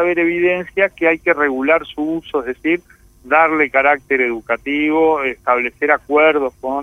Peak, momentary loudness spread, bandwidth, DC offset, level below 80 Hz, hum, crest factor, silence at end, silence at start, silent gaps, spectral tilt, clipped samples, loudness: 0 dBFS; 8 LU; 11.5 kHz; under 0.1%; -50 dBFS; none; 16 dB; 0 s; 0 s; none; -6 dB/octave; under 0.1%; -16 LUFS